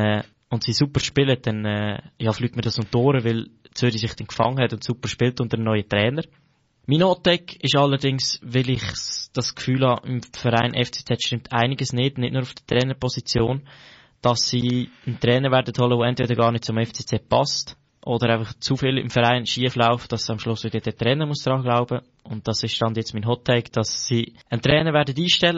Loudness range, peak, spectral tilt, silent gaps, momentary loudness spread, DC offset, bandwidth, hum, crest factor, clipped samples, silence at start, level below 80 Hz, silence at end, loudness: 2 LU; -4 dBFS; -4.5 dB/octave; none; 8 LU; under 0.1%; 8 kHz; none; 18 dB; under 0.1%; 0 s; -50 dBFS; 0 s; -22 LUFS